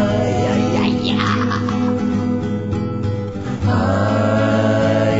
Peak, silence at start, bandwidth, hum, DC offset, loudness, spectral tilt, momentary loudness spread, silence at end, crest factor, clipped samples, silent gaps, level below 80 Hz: -2 dBFS; 0 s; 8 kHz; none; 0.8%; -18 LUFS; -7 dB/octave; 6 LU; 0 s; 16 dB; under 0.1%; none; -40 dBFS